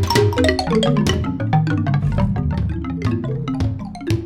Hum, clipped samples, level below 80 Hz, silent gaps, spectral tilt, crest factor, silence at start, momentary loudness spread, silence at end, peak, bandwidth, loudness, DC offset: none; under 0.1%; -30 dBFS; none; -6.5 dB/octave; 18 dB; 0 s; 7 LU; 0 s; 0 dBFS; 15.5 kHz; -19 LUFS; 0.1%